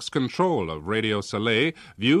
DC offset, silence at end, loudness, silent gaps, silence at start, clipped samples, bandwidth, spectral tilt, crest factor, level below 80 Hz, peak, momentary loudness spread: under 0.1%; 0 s; -24 LUFS; none; 0 s; under 0.1%; 12 kHz; -5.5 dB/octave; 14 dB; -54 dBFS; -10 dBFS; 5 LU